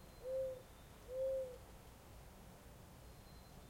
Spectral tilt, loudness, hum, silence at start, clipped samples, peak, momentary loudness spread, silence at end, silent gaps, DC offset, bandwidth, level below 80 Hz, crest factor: -5.5 dB/octave; -45 LUFS; none; 0 s; under 0.1%; -34 dBFS; 17 LU; 0 s; none; under 0.1%; 16.5 kHz; -64 dBFS; 14 dB